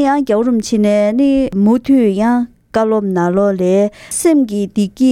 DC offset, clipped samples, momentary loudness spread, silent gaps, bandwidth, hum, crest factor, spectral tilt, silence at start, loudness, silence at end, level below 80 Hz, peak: under 0.1%; under 0.1%; 5 LU; none; 14.5 kHz; none; 12 dB; -6 dB/octave; 0 s; -14 LUFS; 0 s; -44 dBFS; 0 dBFS